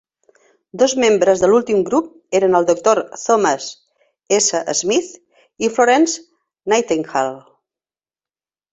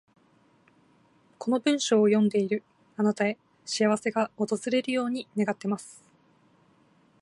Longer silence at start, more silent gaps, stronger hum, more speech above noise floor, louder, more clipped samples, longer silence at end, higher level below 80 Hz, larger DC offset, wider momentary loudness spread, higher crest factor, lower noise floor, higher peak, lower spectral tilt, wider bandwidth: second, 0.75 s vs 1.4 s; neither; neither; first, over 74 dB vs 37 dB; first, -16 LUFS vs -27 LUFS; neither; about the same, 1.35 s vs 1.3 s; first, -60 dBFS vs -78 dBFS; neither; about the same, 10 LU vs 12 LU; about the same, 16 dB vs 18 dB; first, under -90 dBFS vs -63 dBFS; first, -2 dBFS vs -10 dBFS; second, -3 dB/octave vs -5 dB/octave; second, 8.4 kHz vs 11.5 kHz